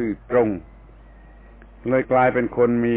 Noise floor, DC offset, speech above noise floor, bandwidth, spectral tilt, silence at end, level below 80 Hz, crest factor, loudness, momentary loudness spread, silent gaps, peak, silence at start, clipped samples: -45 dBFS; under 0.1%; 26 dB; 3.9 kHz; -11.5 dB/octave; 0 s; -46 dBFS; 16 dB; -20 LUFS; 10 LU; none; -6 dBFS; 0 s; under 0.1%